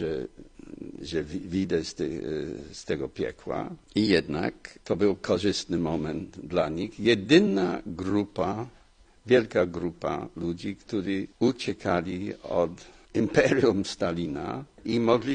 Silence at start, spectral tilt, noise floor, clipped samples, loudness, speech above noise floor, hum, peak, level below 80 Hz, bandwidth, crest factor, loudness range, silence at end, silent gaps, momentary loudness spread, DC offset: 0 s; -6 dB/octave; -55 dBFS; under 0.1%; -28 LUFS; 28 dB; none; -6 dBFS; -54 dBFS; 10 kHz; 22 dB; 5 LU; 0 s; none; 13 LU; under 0.1%